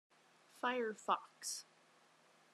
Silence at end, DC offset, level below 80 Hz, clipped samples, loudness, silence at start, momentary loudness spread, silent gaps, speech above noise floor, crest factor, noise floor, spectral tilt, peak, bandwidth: 0.9 s; under 0.1%; under -90 dBFS; under 0.1%; -41 LUFS; 0.55 s; 8 LU; none; 29 dB; 24 dB; -70 dBFS; -1.5 dB/octave; -20 dBFS; 13.5 kHz